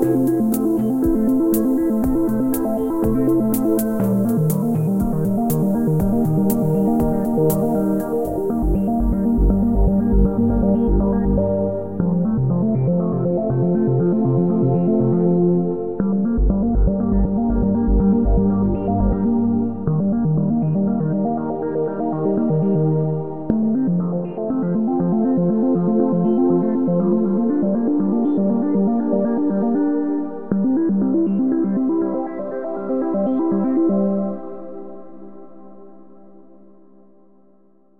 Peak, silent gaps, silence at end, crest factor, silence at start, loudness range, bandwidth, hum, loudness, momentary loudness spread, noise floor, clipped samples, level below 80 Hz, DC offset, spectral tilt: -2 dBFS; none; 0 s; 16 dB; 0 s; 2 LU; 16 kHz; none; -19 LUFS; 5 LU; -56 dBFS; under 0.1%; -28 dBFS; 1%; -10 dB/octave